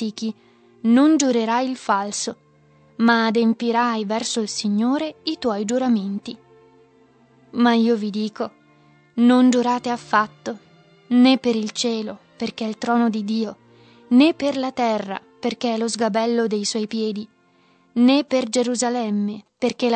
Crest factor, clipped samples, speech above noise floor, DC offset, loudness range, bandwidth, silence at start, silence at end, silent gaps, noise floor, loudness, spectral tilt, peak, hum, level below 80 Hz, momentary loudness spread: 18 dB; under 0.1%; 38 dB; under 0.1%; 4 LU; 9 kHz; 0 s; 0 s; none; -58 dBFS; -20 LUFS; -4 dB/octave; -4 dBFS; none; -70 dBFS; 14 LU